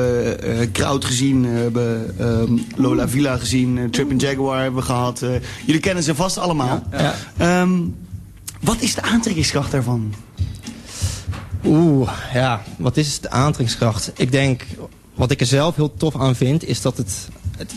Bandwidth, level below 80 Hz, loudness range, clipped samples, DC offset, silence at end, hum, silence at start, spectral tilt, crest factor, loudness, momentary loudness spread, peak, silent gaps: 13 kHz; -38 dBFS; 2 LU; under 0.1%; under 0.1%; 0 s; none; 0 s; -5.5 dB/octave; 16 dB; -19 LUFS; 11 LU; -4 dBFS; none